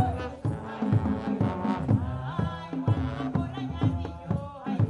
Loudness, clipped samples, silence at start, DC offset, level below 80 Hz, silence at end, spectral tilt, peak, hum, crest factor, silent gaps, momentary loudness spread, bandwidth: -30 LUFS; under 0.1%; 0 s; under 0.1%; -46 dBFS; 0 s; -9 dB/octave; -10 dBFS; none; 18 dB; none; 6 LU; 9.8 kHz